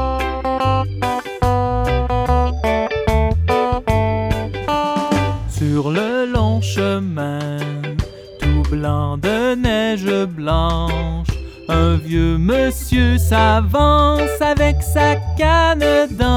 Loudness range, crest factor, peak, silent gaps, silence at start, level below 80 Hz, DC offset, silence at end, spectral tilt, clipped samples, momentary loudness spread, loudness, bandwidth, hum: 5 LU; 16 dB; 0 dBFS; none; 0 s; -24 dBFS; under 0.1%; 0 s; -6.5 dB/octave; under 0.1%; 8 LU; -17 LUFS; 16.5 kHz; none